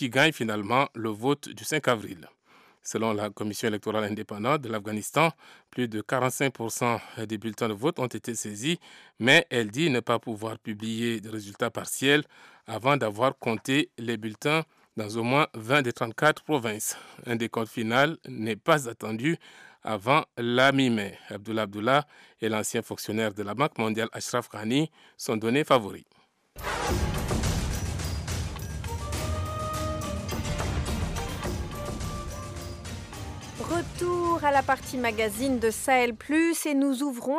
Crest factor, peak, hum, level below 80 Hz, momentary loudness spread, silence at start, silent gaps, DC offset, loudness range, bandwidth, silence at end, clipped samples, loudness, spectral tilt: 20 dB; -8 dBFS; none; -44 dBFS; 11 LU; 0 s; none; under 0.1%; 6 LU; 15.5 kHz; 0 s; under 0.1%; -27 LUFS; -4.5 dB/octave